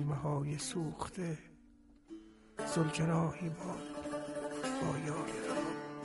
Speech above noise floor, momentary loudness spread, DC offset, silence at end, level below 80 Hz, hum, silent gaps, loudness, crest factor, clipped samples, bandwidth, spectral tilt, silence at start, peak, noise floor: 26 dB; 13 LU; under 0.1%; 0 s; -64 dBFS; none; none; -38 LUFS; 18 dB; under 0.1%; 11.5 kHz; -5.5 dB/octave; 0 s; -20 dBFS; -62 dBFS